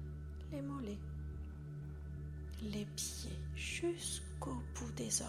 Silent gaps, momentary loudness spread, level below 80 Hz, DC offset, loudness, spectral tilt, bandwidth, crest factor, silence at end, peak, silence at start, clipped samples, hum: none; 9 LU; -50 dBFS; under 0.1%; -44 LUFS; -4 dB/octave; 15 kHz; 22 dB; 0 s; -22 dBFS; 0 s; under 0.1%; none